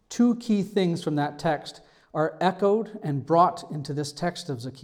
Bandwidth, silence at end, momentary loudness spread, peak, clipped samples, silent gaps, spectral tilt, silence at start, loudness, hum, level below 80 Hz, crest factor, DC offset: 14 kHz; 0.05 s; 12 LU; -8 dBFS; under 0.1%; none; -6.5 dB/octave; 0.1 s; -26 LUFS; none; -64 dBFS; 18 dB; under 0.1%